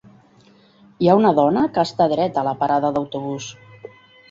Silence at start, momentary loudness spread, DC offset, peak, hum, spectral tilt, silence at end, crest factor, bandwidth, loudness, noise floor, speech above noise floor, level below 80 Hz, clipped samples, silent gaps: 1 s; 13 LU; under 0.1%; -2 dBFS; none; -6.5 dB/octave; 0.45 s; 18 dB; 7.8 kHz; -19 LUFS; -52 dBFS; 34 dB; -58 dBFS; under 0.1%; none